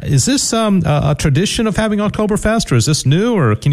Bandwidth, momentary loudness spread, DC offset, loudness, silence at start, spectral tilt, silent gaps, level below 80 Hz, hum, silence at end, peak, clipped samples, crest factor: 13.5 kHz; 3 LU; under 0.1%; -14 LUFS; 0 s; -5 dB/octave; none; -32 dBFS; none; 0 s; -2 dBFS; under 0.1%; 10 dB